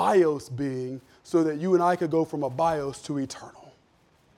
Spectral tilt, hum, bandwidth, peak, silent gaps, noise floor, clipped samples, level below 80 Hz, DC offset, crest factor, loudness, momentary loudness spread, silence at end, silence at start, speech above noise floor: -6.5 dB/octave; none; 13 kHz; -10 dBFS; none; -63 dBFS; under 0.1%; -64 dBFS; under 0.1%; 16 dB; -26 LUFS; 14 LU; 0.7 s; 0 s; 37 dB